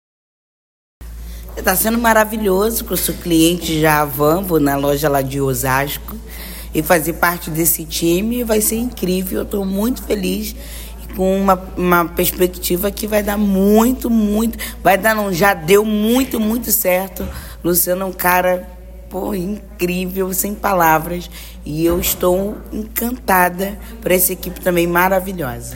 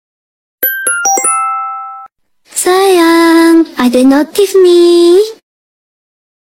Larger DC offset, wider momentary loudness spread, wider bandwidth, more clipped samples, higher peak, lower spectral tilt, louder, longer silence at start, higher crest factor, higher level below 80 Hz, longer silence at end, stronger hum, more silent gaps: neither; about the same, 12 LU vs 12 LU; about the same, 16.5 kHz vs 17 kHz; neither; about the same, 0 dBFS vs 0 dBFS; first, -4.5 dB/octave vs -1.5 dB/octave; second, -16 LUFS vs -8 LUFS; first, 1 s vs 0.6 s; first, 16 dB vs 10 dB; first, -34 dBFS vs -54 dBFS; second, 0 s vs 1.25 s; neither; neither